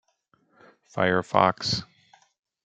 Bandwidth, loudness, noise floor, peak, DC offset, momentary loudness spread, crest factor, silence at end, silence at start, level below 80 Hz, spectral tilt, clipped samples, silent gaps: 9.2 kHz; -24 LUFS; -68 dBFS; -4 dBFS; under 0.1%; 8 LU; 24 dB; 0.8 s; 0.95 s; -66 dBFS; -4.5 dB/octave; under 0.1%; none